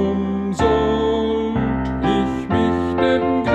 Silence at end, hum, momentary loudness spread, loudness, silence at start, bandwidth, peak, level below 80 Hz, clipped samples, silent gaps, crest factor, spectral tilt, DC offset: 0 s; none; 4 LU; -19 LUFS; 0 s; 9 kHz; -4 dBFS; -34 dBFS; under 0.1%; none; 14 dB; -7 dB/octave; under 0.1%